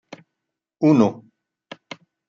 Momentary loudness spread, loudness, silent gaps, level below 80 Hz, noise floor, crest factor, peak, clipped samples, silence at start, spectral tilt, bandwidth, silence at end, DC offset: 24 LU; -18 LUFS; none; -70 dBFS; -82 dBFS; 20 dB; -4 dBFS; under 0.1%; 0.8 s; -8 dB/octave; 7.2 kHz; 1.15 s; under 0.1%